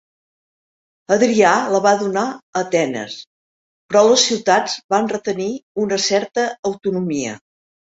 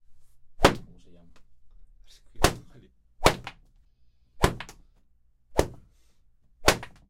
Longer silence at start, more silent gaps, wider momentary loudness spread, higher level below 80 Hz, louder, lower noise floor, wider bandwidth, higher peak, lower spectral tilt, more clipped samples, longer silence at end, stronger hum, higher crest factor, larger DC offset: first, 1.1 s vs 0.1 s; first, 2.42-2.53 s, 3.27-3.89 s, 4.84-4.89 s, 5.63-5.75 s, 6.59-6.63 s vs none; second, 11 LU vs 18 LU; second, -64 dBFS vs -38 dBFS; first, -18 LUFS vs -26 LUFS; first, under -90 dBFS vs -62 dBFS; second, 8 kHz vs 16 kHz; about the same, -2 dBFS vs -2 dBFS; about the same, -3.5 dB/octave vs -4 dB/octave; neither; first, 0.45 s vs 0.2 s; neither; second, 18 dB vs 28 dB; neither